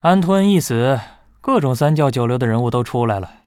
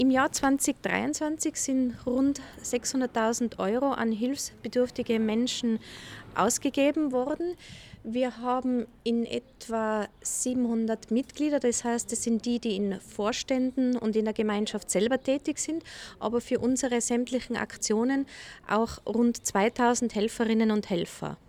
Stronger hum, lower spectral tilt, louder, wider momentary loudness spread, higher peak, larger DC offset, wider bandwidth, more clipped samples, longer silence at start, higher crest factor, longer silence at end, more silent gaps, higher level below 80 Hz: neither; first, -6.5 dB/octave vs -4 dB/octave; first, -17 LUFS vs -28 LUFS; about the same, 6 LU vs 7 LU; first, -2 dBFS vs -10 dBFS; neither; about the same, 16.5 kHz vs 16 kHz; neither; about the same, 0.05 s vs 0 s; about the same, 14 dB vs 18 dB; about the same, 0.2 s vs 0.15 s; neither; first, -50 dBFS vs -58 dBFS